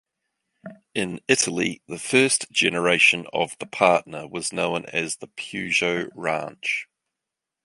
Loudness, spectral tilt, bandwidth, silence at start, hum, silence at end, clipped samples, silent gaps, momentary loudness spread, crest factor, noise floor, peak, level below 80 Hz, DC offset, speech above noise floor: -22 LUFS; -2.5 dB/octave; 11.5 kHz; 0.65 s; none; 0.8 s; under 0.1%; none; 12 LU; 22 dB; -85 dBFS; -2 dBFS; -64 dBFS; under 0.1%; 62 dB